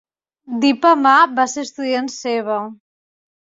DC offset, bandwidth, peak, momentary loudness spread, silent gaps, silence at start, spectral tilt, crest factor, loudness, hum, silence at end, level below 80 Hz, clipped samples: under 0.1%; 7.8 kHz; -2 dBFS; 13 LU; none; 0.5 s; -3 dB/octave; 16 dB; -16 LUFS; none; 0.65 s; -68 dBFS; under 0.1%